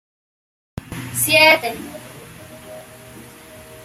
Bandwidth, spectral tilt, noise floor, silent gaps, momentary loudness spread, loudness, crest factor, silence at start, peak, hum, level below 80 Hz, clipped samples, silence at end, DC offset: 16 kHz; -2 dB/octave; -41 dBFS; none; 27 LU; -14 LUFS; 22 dB; 0.9 s; 0 dBFS; none; -52 dBFS; under 0.1%; 0 s; under 0.1%